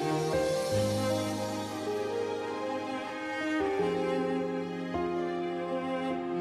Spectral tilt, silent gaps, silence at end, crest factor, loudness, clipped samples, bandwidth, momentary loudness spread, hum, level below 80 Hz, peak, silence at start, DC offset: -5.5 dB/octave; none; 0 s; 14 dB; -32 LUFS; under 0.1%; 13.5 kHz; 6 LU; none; -60 dBFS; -18 dBFS; 0 s; under 0.1%